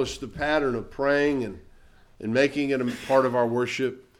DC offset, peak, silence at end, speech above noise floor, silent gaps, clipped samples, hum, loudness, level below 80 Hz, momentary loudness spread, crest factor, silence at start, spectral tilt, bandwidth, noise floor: under 0.1%; -8 dBFS; 0.2 s; 28 dB; none; under 0.1%; none; -25 LUFS; -50 dBFS; 8 LU; 18 dB; 0 s; -5.5 dB/octave; 15 kHz; -53 dBFS